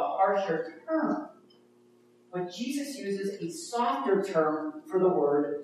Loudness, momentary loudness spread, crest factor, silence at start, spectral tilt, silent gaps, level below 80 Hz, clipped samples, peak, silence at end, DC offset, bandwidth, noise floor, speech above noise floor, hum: -30 LUFS; 10 LU; 16 dB; 0 s; -5.5 dB/octave; none; -86 dBFS; under 0.1%; -14 dBFS; 0 s; under 0.1%; 13.5 kHz; -61 dBFS; 32 dB; none